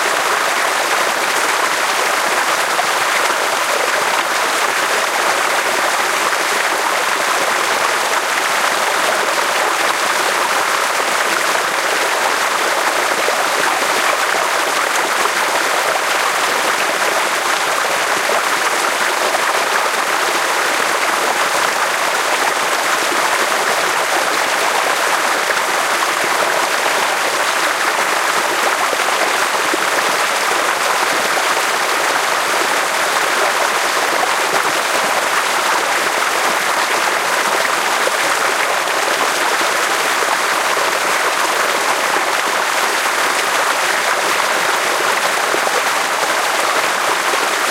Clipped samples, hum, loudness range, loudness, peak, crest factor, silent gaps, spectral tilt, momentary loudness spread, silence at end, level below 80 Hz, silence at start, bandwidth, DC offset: under 0.1%; none; 0 LU; -15 LUFS; 0 dBFS; 16 dB; none; 0 dB/octave; 1 LU; 0 s; -66 dBFS; 0 s; 16 kHz; under 0.1%